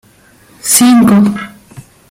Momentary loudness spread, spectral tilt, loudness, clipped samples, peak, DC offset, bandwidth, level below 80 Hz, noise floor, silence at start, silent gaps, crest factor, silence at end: 17 LU; -4 dB/octave; -8 LUFS; 0.1%; 0 dBFS; under 0.1%; 17 kHz; -48 dBFS; -44 dBFS; 0.65 s; none; 12 dB; 0.3 s